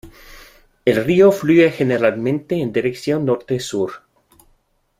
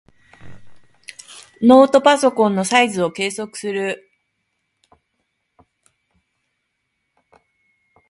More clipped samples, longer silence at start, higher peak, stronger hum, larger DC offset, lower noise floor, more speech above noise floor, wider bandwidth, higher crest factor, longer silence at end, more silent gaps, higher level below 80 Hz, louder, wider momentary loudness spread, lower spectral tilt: neither; second, 0.05 s vs 0.45 s; about the same, -2 dBFS vs 0 dBFS; neither; neither; second, -61 dBFS vs -73 dBFS; second, 45 dB vs 58 dB; first, 15.5 kHz vs 11.5 kHz; about the same, 16 dB vs 20 dB; second, 1 s vs 4.15 s; neither; first, -52 dBFS vs -62 dBFS; about the same, -17 LUFS vs -16 LUFS; second, 10 LU vs 26 LU; first, -6.5 dB/octave vs -4 dB/octave